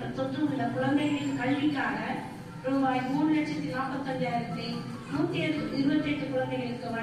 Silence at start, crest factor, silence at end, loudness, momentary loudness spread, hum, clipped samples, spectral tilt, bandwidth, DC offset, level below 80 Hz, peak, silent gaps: 0 s; 14 dB; 0 s; -30 LUFS; 7 LU; none; under 0.1%; -6.5 dB/octave; 11.5 kHz; under 0.1%; -60 dBFS; -16 dBFS; none